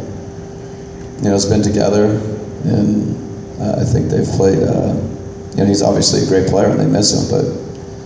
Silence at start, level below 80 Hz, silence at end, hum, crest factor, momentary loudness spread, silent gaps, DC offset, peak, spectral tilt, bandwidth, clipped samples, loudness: 0 s; -34 dBFS; 0 s; none; 16 dB; 17 LU; none; under 0.1%; 0 dBFS; -5.5 dB/octave; 8 kHz; under 0.1%; -15 LUFS